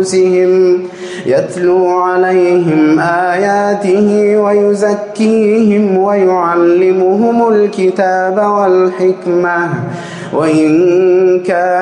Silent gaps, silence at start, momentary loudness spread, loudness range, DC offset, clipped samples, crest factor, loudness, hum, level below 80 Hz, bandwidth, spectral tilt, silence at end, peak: none; 0 s; 5 LU; 1 LU; under 0.1%; under 0.1%; 8 dB; -10 LUFS; none; -60 dBFS; 10.5 kHz; -6.5 dB/octave; 0 s; -2 dBFS